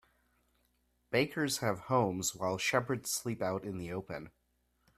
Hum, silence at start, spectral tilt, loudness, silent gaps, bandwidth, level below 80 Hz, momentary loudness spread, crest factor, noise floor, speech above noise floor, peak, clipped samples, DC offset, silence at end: none; 1.1 s; -4 dB/octave; -34 LUFS; none; 15.5 kHz; -68 dBFS; 9 LU; 22 dB; -76 dBFS; 41 dB; -14 dBFS; under 0.1%; under 0.1%; 0.7 s